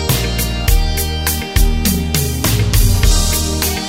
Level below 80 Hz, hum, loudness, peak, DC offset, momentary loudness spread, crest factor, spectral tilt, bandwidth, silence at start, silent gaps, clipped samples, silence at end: -16 dBFS; none; -15 LUFS; 0 dBFS; under 0.1%; 4 LU; 14 dB; -4 dB/octave; 16.5 kHz; 0 s; none; under 0.1%; 0 s